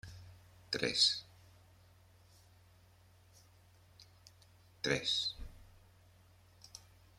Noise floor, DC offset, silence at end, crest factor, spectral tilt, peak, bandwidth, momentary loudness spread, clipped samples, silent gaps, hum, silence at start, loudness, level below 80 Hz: -65 dBFS; under 0.1%; 0.4 s; 28 dB; -2 dB/octave; -16 dBFS; 16.5 kHz; 27 LU; under 0.1%; none; none; 0.05 s; -34 LUFS; -62 dBFS